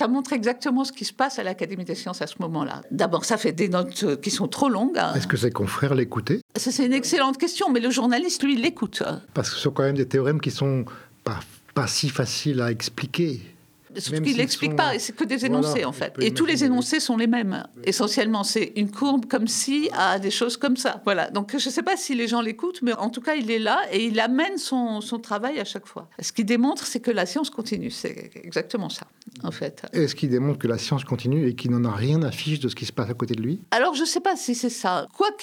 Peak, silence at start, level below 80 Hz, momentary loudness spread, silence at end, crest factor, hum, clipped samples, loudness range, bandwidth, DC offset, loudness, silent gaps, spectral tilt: -4 dBFS; 0 s; -66 dBFS; 8 LU; 0 s; 20 dB; none; under 0.1%; 4 LU; 17 kHz; under 0.1%; -24 LUFS; 6.42-6.49 s; -4.5 dB/octave